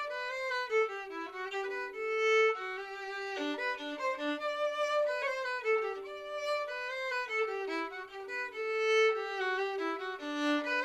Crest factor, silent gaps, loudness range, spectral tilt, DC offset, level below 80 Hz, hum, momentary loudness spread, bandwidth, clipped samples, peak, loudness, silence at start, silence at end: 16 dB; none; 2 LU; -1.5 dB/octave; under 0.1%; -76 dBFS; none; 11 LU; 13 kHz; under 0.1%; -18 dBFS; -33 LUFS; 0 s; 0 s